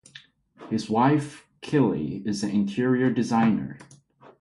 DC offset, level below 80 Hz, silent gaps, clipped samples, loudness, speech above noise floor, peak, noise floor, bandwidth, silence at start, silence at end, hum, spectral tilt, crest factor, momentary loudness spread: under 0.1%; -60 dBFS; none; under 0.1%; -24 LUFS; 28 dB; -8 dBFS; -52 dBFS; 11.5 kHz; 0.15 s; 0.55 s; none; -7 dB/octave; 16 dB; 9 LU